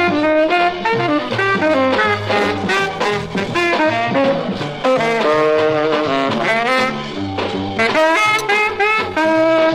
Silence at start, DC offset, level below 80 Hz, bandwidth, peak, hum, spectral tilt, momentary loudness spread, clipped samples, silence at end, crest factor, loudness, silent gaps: 0 s; under 0.1%; -48 dBFS; 15.5 kHz; -4 dBFS; none; -5 dB/octave; 6 LU; under 0.1%; 0 s; 12 dB; -16 LUFS; none